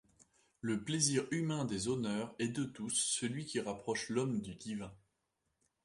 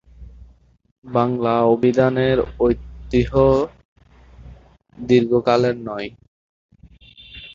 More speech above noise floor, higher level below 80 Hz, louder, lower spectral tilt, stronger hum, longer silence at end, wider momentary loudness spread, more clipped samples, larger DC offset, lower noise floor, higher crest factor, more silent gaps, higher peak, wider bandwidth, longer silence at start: first, 47 dB vs 32 dB; second, -70 dBFS vs -40 dBFS; second, -37 LUFS vs -18 LUFS; second, -4 dB/octave vs -8 dB/octave; neither; first, 0.9 s vs 0.05 s; second, 11 LU vs 14 LU; neither; neither; first, -84 dBFS vs -49 dBFS; first, 26 dB vs 18 dB; second, none vs 0.91-1.02 s, 3.85-3.96 s, 6.28-6.69 s; second, -14 dBFS vs -2 dBFS; first, 11.5 kHz vs 7.4 kHz; first, 0.65 s vs 0.2 s